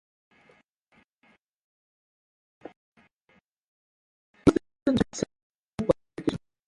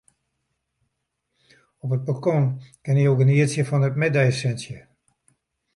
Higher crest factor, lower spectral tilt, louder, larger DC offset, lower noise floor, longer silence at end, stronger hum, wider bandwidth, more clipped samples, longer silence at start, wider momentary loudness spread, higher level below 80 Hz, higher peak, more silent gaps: first, 28 dB vs 16 dB; about the same, -6.5 dB/octave vs -7 dB/octave; second, -28 LUFS vs -21 LUFS; neither; second, -67 dBFS vs -77 dBFS; second, 0.3 s vs 0.95 s; neither; about the same, 11.5 kHz vs 11.5 kHz; neither; first, 4.45 s vs 1.85 s; first, 26 LU vs 16 LU; first, -54 dBFS vs -62 dBFS; about the same, -6 dBFS vs -6 dBFS; first, 4.82-4.86 s, 5.42-5.73 s vs none